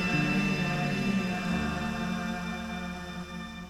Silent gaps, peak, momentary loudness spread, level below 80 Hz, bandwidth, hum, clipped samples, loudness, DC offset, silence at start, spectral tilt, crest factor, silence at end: none; -16 dBFS; 11 LU; -46 dBFS; 15 kHz; none; under 0.1%; -31 LUFS; under 0.1%; 0 s; -5.5 dB/octave; 14 dB; 0 s